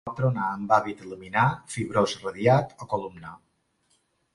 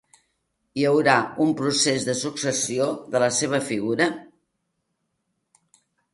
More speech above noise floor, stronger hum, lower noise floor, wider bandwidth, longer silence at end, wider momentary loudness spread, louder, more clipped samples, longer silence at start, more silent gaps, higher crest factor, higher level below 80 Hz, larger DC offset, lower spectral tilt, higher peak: second, 44 dB vs 54 dB; neither; second, -70 dBFS vs -76 dBFS; about the same, 11.5 kHz vs 11.5 kHz; second, 0.95 s vs 1.9 s; first, 16 LU vs 6 LU; second, -26 LUFS vs -22 LUFS; neither; second, 0.05 s vs 0.75 s; neither; about the same, 22 dB vs 22 dB; first, -58 dBFS vs -68 dBFS; neither; first, -6 dB/octave vs -3.5 dB/octave; second, -6 dBFS vs -2 dBFS